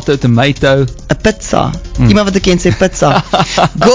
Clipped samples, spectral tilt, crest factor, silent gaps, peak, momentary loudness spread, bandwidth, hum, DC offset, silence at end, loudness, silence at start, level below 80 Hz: 1%; -5.5 dB/octave; 10 dB; none; 0 dBFS; 4 LU; 8 kHz; none; under 0.1%; 0 s; -11 LUFS; 0 s; -26 dBFS